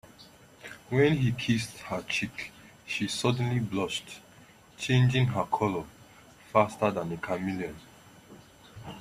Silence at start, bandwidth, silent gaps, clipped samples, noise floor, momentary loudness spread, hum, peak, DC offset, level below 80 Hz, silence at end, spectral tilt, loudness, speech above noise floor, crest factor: 0.2 s; 13 kHz; none; under 0.1%; -55 dBFS; 21 LU; none; -8 dBFS; under 0.1%; -60 dBFS; 0 s; -6 dB/octave; -29 LUFS; 27 dB; 22 dB